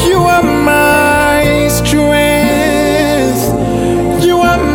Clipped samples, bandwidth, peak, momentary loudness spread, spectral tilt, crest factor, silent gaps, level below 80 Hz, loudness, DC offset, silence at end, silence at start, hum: under 0.1%; 17.5 kHz; 0 dBFS; 4 LU; -5 dB/octave; 10 dB; none; -26 dBFS; -10 LUFS; under 0.1%; 0 s; 0 s; none